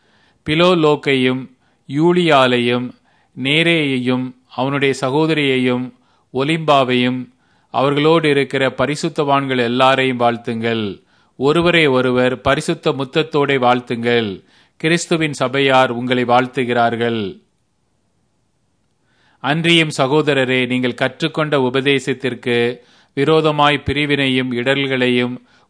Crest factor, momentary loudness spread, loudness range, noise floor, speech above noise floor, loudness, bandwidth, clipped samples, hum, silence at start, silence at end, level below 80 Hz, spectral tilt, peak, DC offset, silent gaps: 16 dB; 9 LU; 2 LU; -65 dBFS; 49 dB; -16 LUFS; 10.5 kHz; under 0.1%; none; 0.45 s; 0.3 s; -52 dBFS; -5.5 dB/octave; 0 dBFS; under 0.1%; none